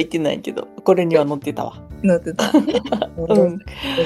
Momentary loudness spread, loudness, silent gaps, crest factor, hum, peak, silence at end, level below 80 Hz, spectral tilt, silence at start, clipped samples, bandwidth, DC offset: 11 LU; -19 LUFS; none; 18 dB; none; -2 dBFS; 0 s; -44 dBFS; -6 dB/octave; 0 s; under 0.1%; 13.5 kHz; under 0.1%